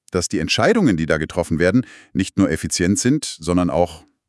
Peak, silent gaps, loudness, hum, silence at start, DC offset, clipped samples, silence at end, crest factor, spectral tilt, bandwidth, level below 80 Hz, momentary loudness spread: -2 dBFS; none; -19 LUFS; none; 0.15 s; under 0.1%; under 0.1%; 0.3 s; 18 dB; -5 dB/octave; 12 kHz; -46 dBFS; 6 LU